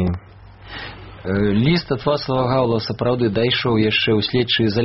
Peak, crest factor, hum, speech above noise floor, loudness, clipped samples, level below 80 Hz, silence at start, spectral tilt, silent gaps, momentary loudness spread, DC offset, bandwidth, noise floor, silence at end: -4 dBFS; 16 dB; none; 24 dB; -18 LUFS; under 0.1%; -42 dBFS; 0 s; -4.5 dB/octave; none; 16 LU; 0.2%; 6 kHz; -42 dBFS; 0 s